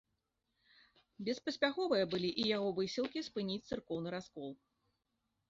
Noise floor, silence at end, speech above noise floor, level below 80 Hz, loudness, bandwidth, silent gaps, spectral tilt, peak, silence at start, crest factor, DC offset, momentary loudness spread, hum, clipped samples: -85 dBFS; 0.95 s; 48 dB; -72 dBFS; -38 LUFS; 7.6 kHz; none; -3.5 dB/octave; -18 dBFS; 1.2 s; 22 dB; under 0.1%; 12 LU; none; under 0.1%